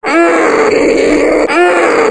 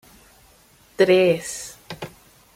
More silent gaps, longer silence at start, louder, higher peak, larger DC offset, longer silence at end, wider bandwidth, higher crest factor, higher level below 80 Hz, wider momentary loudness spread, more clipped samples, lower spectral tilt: neither; second, 0 s vs 1 s; first, -9 LUFS vs -19 LUFS; first, 0 dBFS vs -4 dBFS; neither; second, 0 s vs 0.5 s; second, 10 kHz vs 16 kHz; second, 8 dB vs 18 dB; first, -38 dBFS vs -60 dBFS; second, 1 LU vs 20 LU; neither; about the same, -4 dB/octave vs -4.5 dB/octave